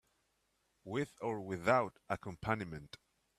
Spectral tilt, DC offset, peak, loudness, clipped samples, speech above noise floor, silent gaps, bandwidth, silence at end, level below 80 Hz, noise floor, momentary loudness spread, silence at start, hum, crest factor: -6.5 dB/octave; under 0.1%; -16 dBFS; -38 LUFS; under 0.1%; 42 dB; none; 14 kHz; 0.4 s; -66 dBFS; -80 dBFS; 21 LU; 0.85 s; none; 24 dB